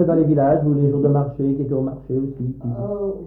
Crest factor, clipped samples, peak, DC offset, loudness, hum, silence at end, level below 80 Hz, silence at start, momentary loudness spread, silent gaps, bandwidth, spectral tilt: 14 dB; under 0.1%; -6 dBFS; under 0.1%; -20 LUFS; none; 0 s; -46 dBFS; 0 s; 10 LU; none; 2.1 kHz; -14 dB/octave